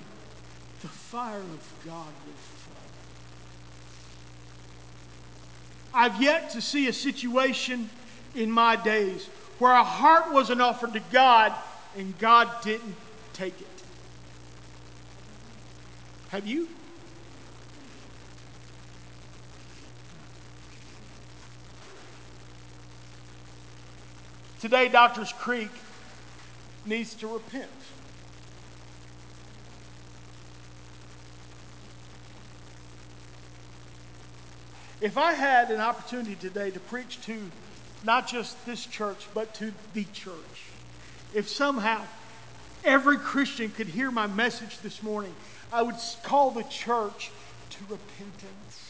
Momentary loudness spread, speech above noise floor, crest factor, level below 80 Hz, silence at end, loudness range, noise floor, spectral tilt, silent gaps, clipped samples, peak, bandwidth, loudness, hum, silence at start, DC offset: 27 LU; 22 dB; 26 dB; -60 dBFS; 0 s; 26 LU; -48 dBFS; -4 dB/octave; none; under 0.1%; -4 dBFS; 8 kHz; -26 LUFS; none; 0 s; 0.4%